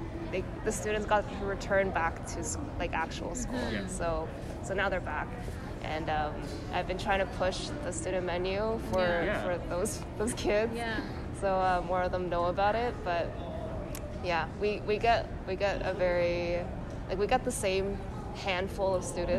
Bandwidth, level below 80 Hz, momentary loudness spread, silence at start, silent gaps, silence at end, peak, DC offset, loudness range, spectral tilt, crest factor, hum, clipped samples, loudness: 14 kHz; -42 dBFS; 8 LU; 0 s; none; 0 s; -14 dBFS; under 0.1%; 3 LU; -5 dB/octave; 18 dB; none; under 0.1%; -32 LUFS